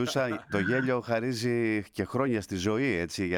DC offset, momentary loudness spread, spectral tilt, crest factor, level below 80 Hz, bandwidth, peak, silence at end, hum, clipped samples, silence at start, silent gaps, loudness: under 0.1%; 3 LU; -5.5 dB/octave; 16 dB; -60 dBFS; 17.5 kHz; -14 dBFS; 0 s; none; under 0.1%; 0 s; none; -29 LUFS